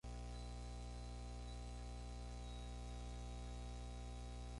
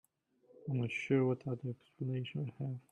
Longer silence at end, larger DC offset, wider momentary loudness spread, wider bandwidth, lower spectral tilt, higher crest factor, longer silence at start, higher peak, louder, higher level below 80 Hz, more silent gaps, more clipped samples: about the same, 0 s vs 0.1 s; neither; second, 1 LU vs 11 LU; first, 11.5 kHz vs 9 kHz; second, -5.5 dB/octave vs -8 dB/octave; second, 8 dB vs 18 dB; second, 0.05 s vs 0.6 s; second, -40 dBFS vs -20 dBFS; second, -52 LUFS vs -38 LUFS; first, -50 dBFS vs -78 dBFS; neither; neither